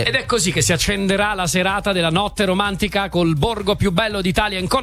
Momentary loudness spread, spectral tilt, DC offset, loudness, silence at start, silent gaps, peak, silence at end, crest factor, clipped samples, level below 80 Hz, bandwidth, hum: 3 LU; -4 dB/octave; under 0.1%; -18 LUFS; 0 s; none; -2 dBFS; 0 s; 16 dB; under 0.1%; -34 dBFS; 15 kHz; none